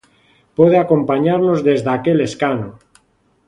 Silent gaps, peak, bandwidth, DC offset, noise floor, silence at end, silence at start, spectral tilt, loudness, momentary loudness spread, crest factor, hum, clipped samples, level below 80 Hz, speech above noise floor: none; 0 dBFS; 10.5 kHz; under 0.1%; -59 dBFS; 0.75 s; 0.6 s; -7.5 dB/octave; -15 LUFS; 10 LU; 16 dB; none; under 0.1%; -54 dBFS; 45 dB